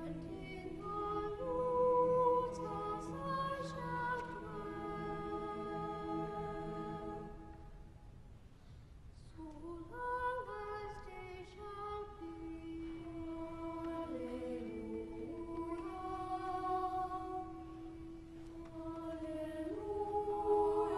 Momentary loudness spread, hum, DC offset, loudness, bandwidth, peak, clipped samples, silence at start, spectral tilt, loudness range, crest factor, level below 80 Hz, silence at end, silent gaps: 18 LU; none; under 0.1%; -41 LUFS; 12 kHz; -22 dBFS; under 0.1%; 0 s; -7 dB/octave; 10 LU; 18 dB; -58 dBFS; 0 s; none